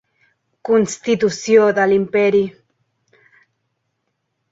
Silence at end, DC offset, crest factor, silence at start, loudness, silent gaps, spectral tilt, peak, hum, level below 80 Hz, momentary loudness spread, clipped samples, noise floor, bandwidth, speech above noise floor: 2 s; under 0.1%; 16 dB; 0.65 s; -16 LUFS; none; -5 dB/octave; -2 dBFS; none; -60 dBFS; 6 LU; under 0.1%; -73 dBFS; 8 kHz; 57 dB